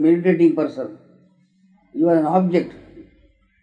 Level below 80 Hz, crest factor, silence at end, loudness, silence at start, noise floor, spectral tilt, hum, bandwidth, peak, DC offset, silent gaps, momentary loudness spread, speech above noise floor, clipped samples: -62 dBFS; 16 dB; 0.6 s; -18 LUFS; 0 s; -57 dBFS; -9.5 dB/octave; none; 5.2 kHz; -4 dBFS; under 0.1%; none; 17 LU; 40 dB; under 0.1%